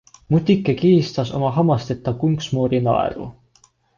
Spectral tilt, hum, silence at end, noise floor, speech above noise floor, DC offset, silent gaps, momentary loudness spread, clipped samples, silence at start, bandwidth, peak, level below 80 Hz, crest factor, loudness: -8 dB/octave; none; 0.65 s; -57 dBFS; 39 dB; under 0.1%; none; 9 LU; under 0.1%; 0.3 s; 7.4 kHz; -4 dBFS; -48 dBFS; 16 dB; -19 LUFS